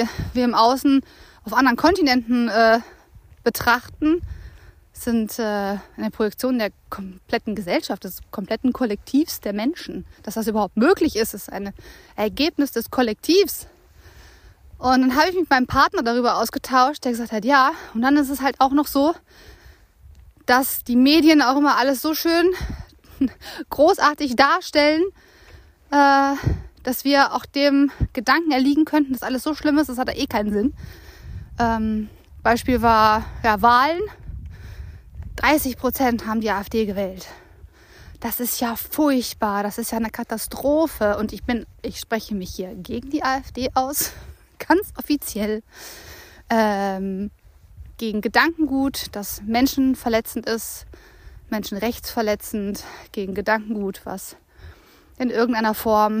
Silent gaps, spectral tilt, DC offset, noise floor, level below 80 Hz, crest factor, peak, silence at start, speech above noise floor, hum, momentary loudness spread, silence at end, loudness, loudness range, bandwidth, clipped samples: none; -4.5 dB/octave; under 0.1%; -50 dBFS; -42 dBFS; 18 dB; -2 dBFS; 0 s; 29 dB; none; 16 LU; 0 s; -20 LUFS; 7 LU; 15.5 kHz; under 0.1%